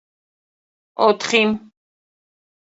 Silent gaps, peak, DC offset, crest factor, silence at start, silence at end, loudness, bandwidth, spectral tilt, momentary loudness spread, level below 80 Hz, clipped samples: none; -2 dBFS; under 0.1%; 22 dB; 1 s; 1.1 s; -17 LUFS; 8 kHz; -3.5 dB/octave; 14 LU; -64 dBFS; under 0.1%